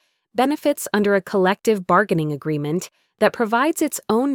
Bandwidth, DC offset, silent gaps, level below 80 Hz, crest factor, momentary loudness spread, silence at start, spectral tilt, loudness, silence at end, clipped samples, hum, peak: 19.5 kHz; under 0.1%; none; -62 dBFS; 16 dB; 7 LU; 0.35 s; -5 dB/octave; -20 LUFS; 0 s; under 0.1%; none; -4 dBFS